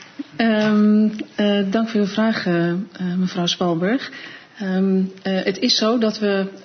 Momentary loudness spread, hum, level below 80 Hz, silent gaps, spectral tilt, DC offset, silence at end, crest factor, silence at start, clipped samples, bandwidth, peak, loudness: 9 LU; none; -68 dBFS; none; -5.5 dB/octave; under 0.1%; 0.05 s; 16 dB; 0 s; under 0.1%; 6.6 kHz; -4 dBFS; -19 LUFS